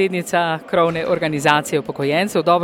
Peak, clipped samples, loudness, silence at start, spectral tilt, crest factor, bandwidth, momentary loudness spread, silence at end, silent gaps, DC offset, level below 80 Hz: 0 dBFS; under 0.1%; -18 LUFS; 0 s; -5 dB/octave; 18 dB; 17.5 kHz; 4 LU; 0 s; none; under 0.1%; -56 dBFS